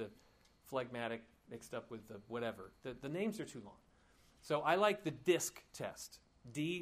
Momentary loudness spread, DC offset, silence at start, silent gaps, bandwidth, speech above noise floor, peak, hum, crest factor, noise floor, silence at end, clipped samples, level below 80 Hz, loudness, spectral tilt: 18 LU; under 0.1%; 0 s; none; 15.5 kHz; 28 dB; -18 dBFS; none; 24 dB; -69 dBFS; 0 s; under 0.1%; -74 dBFS; -40 LUFS; -4 dB/octave